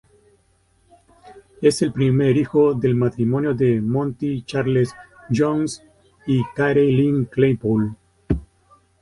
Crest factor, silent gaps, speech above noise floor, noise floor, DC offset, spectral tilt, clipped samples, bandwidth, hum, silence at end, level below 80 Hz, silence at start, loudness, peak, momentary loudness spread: 16 dB; none; 42 dB; -61 dBFS; under 0.1%; -7.5 dB/octave; under 0.1%; 11.5 kHz; none; 0.55 s; -44 dBFS; 1.25 s; -20 LUFS; -4 dBFS; 9 LU